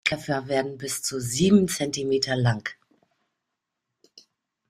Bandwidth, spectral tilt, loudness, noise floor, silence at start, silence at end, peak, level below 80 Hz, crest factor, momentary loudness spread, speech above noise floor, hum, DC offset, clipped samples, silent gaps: 15 kHz; -4.5 dB/octave; -24 LUFS; -83 dBFS; 0.05 s; 1.95 s; -6 dBFS; -58 dBFS; 20 dB; 10 LU; 59 dB; none; under 0.1%; under 0.1%; none